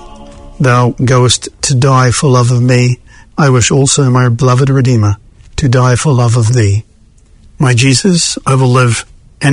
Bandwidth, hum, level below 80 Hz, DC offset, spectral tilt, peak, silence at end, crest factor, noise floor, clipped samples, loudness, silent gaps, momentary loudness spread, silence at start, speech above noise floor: 11 kHz; none; -34 dBFS; under 0.1%; -5 dB/octave; 0 dBFS; 0 s; 10 dB; -43 dBFS; 0.2%; -10 LUFS; none; 7 LU; 0 s; 34 dB